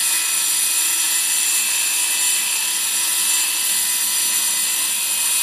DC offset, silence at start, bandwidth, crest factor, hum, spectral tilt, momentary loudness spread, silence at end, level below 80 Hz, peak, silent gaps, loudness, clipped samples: under 0.1%; 0 s; 16 kHz; 14 dB; none; 3.5 dB/octave; 2 LU; 0 s; -72 dBFS; -6 dBFS; none; -16 LUFS; under 0.1%